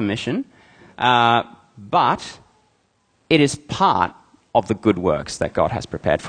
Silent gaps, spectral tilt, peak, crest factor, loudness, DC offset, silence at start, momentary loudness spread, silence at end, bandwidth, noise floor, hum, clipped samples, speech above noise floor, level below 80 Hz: none; -5 dB/octave; -2 dBFS; 20 dB; -20 LUFS; under 0.1%; 0 s; 10 LU; 0 s; 9.8 kHz; -64 dBFS; none; under 0.1%; 45 dB; -48 dBFS